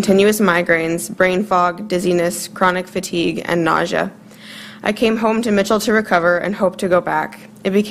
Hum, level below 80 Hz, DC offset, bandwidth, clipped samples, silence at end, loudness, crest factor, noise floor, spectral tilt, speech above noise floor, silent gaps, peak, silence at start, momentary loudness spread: none; -50 dBFS; under 0.1%; 15.5 kHz; under 0.1%; 0 s; -17 LUFS; 16 dB; -36 dBFS; -5 dB/octave; 20 dB; none; 0 dBFS; 0 s; 8 LU